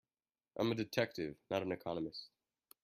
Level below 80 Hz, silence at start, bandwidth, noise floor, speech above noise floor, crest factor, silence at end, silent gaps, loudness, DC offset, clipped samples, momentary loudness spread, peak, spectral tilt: -74 dBFS; 0.55 s; 15.5 kHz; under -90 dBFS; over 51 dB; 24 dB; 0.55 s; none; -40 LUFS; under 0.1%; under 0.1%; 14 LU; -18 dBFS; -6 dB/octave